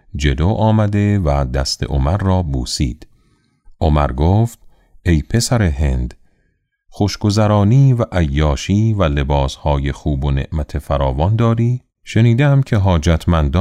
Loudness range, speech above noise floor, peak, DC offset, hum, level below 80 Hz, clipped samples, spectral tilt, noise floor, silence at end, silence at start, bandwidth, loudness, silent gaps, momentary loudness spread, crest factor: 3 LU; 49 dB; -2 dBFS; under 0.1%; none; -24 dBFS; under 0.1%; -6.5 dB/octave; -64 dBFS; 0 s; 0.15 s; 13.5 kHz; -16 LUFS; none; 7 LU; 14 dB